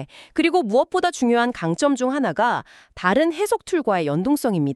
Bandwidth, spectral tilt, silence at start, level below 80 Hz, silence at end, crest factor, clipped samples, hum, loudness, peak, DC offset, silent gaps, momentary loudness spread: 13.5 kHz; -5.5 dB/octave; 0 s; -56 dBFS; 0 s; 16 dB; under 0.1%; none; -21 LUFS; -4 dBFS; under 0.1%; none; 3 LU